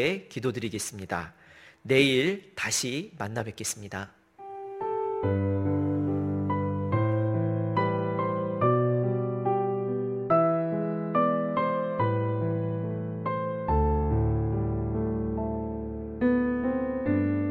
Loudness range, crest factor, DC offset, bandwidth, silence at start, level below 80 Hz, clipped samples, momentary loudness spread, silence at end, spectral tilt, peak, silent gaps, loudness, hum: 3 LU; 20 dB; under 0.1%; 15.5 kHz; 0 s; -42 dBFS; under 0.1%; 9 LU; 0 s; -6 dB/octave; -6 dBFS; none; -28 LUFS; none